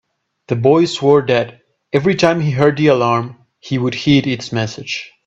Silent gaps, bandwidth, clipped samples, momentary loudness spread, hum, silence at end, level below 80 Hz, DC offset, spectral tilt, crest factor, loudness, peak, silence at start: none; 8 kHz; under 0.1%; 11 LU; none; 0.2 s; -52 dBFS; under 0.1%; -6 dB/octave; 16 dB; -15 LUFS; 0 dBFS; 0.5 s